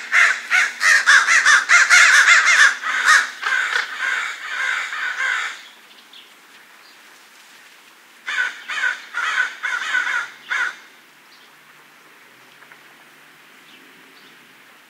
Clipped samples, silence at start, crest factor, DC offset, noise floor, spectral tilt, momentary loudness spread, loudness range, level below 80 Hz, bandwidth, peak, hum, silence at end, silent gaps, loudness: under 0.1%; 0 s; 20 dB; under 0.1%; -48 dBFS; 4 dB/octave; 14 LU; 18 LU; under -90 dBFS; 16 kHz; 0 dBFS; none; 4.15 s; none; -15 LUFS